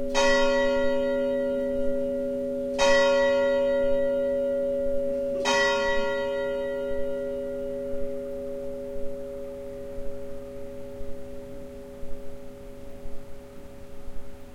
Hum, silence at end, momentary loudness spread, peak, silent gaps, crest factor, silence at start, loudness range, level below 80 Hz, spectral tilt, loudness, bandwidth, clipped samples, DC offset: none; 0 s; 22 LU; -8 dBFS; none; 18 dB; 0 s; 18 LU; -42 dBFS; -3.5 dB/octave; -26 LUFS; 12.5 kHz; under 0.1%; under 0.1%